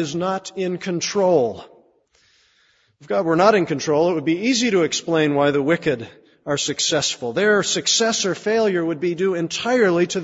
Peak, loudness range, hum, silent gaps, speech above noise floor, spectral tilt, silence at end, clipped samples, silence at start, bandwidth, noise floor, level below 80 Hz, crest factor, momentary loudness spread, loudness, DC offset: -2 dBFS; 3 LU; none; none; 41 dB; -3.5 dB/octave; 0 s; under 0.1%; 0 s; 8 kHz; -60 dBFS; -62 dBFS; 18 dB; 8 LU; -19 LUFS; under 0.1%